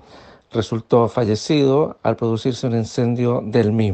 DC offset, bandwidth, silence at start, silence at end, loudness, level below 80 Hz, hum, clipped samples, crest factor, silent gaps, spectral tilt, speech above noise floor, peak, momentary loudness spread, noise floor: under 0.1%; 8.6 kHz; 0.15 s; 0 s; -19 LUFS; -56 dBFS; none; under 0.1%; 16 dB; none; -7 dB/octave; 27 dB; -2 dBFS; 7 LU; -45 dBFS